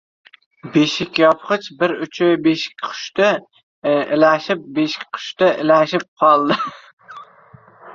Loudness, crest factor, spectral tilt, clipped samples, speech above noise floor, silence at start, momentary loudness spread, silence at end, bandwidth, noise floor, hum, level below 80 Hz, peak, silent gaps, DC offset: -17 LUFS; 16 dB; -5 dB/octave; under 0.1%; 30 dB; 0.65 s; 10 LU; 0 s; 7.4 kHz; -47 dBFS; none; -62 dBFS; -2 dBFS; 3.63-3.82 s, 6.08-6.16 s, 6.93-6.97 s; under 0.1%